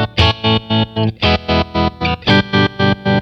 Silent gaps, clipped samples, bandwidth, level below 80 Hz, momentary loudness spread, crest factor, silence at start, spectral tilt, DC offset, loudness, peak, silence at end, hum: none; under 0.1%; 7.6 kHz; -30 dBFS; 5 LU; 14 dB; 0 s; -6.5 dB/octave; under 0.1%; -15 LUFS; 0 dBFS; 0 s; none